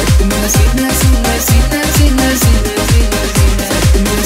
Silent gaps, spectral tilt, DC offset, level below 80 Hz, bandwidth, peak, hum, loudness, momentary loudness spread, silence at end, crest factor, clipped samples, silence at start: none; -4.5 dB/octave; under 0.1%; -14 dBFS; 16.5 kHz; 0 dBFS; none; -11 LUFS; 2 LU; 0 s; 10 dB; under 0.1%; 0 s